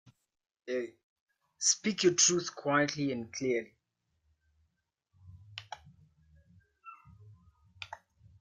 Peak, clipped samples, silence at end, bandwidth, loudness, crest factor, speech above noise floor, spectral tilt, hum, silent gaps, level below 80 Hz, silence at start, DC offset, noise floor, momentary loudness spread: -12 dBFS; under 0.1%; 0.45 s; 10.5 kHz; -30 LUFS; 24 dB; 50 dB; -2.5 dB/octave; none; 1.03-1.26 s; -74 dBFS; 0.65 s; under 0.1%; -81 dBFS; 26 LU